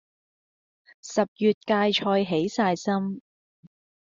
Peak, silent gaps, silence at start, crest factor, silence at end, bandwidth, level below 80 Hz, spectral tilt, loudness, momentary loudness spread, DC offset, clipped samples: -8 dBFS; 1.28-1.36 s, 1.54-1.61 s; 1.05 s; 18 dB; 0.85 s; 7.6 kHz; -68 dBFS; -5 dB/octave; -25 LUFS; 10 LU; under 0.1%; under 0.1%